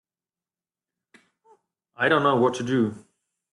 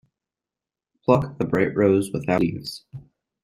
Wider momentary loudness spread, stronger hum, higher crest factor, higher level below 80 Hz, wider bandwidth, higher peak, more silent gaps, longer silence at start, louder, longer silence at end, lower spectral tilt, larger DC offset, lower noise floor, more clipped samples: second, 6 LU vs 14 LU; neither; about the same, 20 dB vs 22 dB; second, -68 dBFS vs -54 dBFS; second, 11.5 kHz vs 15 kHz; second, -8 dBFS vs -2 dBFS; neither; first, 2 s vs 1.1 s; about the same, -23 LUFS vs -22 LUFS; first, 0.55 s vs 0.4 s; about the same, -6 dB/octave vs -7 dB/octave; neither; about the same, under -90 dBFS vs -89 dBFS; neither